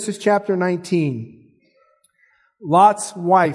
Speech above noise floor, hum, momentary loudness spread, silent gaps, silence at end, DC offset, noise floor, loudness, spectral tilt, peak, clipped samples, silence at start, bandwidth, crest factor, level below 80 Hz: 43 dB; none; 17 LU; none; 0 s; under 0.1%; -60 dBFS; -18 LUFS; -5.5 dB/octave; -2 dBFS; under 0.1%; 0 s; 12 kHz; 18 dB; -72 dBFS